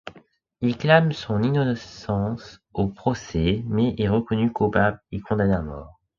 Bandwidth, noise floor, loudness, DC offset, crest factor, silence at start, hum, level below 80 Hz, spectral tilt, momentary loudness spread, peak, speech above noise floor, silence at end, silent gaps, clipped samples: 7.4 kHz; -54 dBFS; -23 LUFS; under 0.1%; 22 dB; 0.05 s; none; -42 dBFS; -7.5 dB/octave; 15 LU; 0 dBFS; 31 dB; 0.25 s; none; under 0.1%